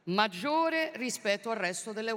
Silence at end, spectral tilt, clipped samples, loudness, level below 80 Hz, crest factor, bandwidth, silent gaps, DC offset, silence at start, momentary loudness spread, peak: 0 s; -3.5 dB/octave; under 0.1%; -31 LUFS; -84 dBFS; 20 dB; 16.5 kHz; none; under 0.1%; 0.05 s; 5 LU; -12 dBFS